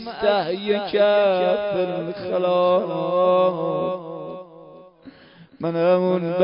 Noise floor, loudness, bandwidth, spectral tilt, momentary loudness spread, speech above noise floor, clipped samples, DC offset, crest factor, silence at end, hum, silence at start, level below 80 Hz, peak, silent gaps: -48 dBFS; -21 LUFS; 5.4 kHz; -11 dB/octave; 12 LU; 28 dB; under 0.1%; under 0.1%; 18 dB; 0 s; none; 0 s; -62 dBFS; -4 dBFS; none